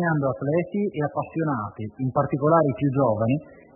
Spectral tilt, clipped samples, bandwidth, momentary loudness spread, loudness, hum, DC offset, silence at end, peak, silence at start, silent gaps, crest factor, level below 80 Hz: -13 dB/octave; under 0.1%; 3.1 kHz; 8 LU; -24 LUFS; none; under 0.1%; 0.2 s; -6 dBFS; 0 s; none; 18 dB; -60 dBFS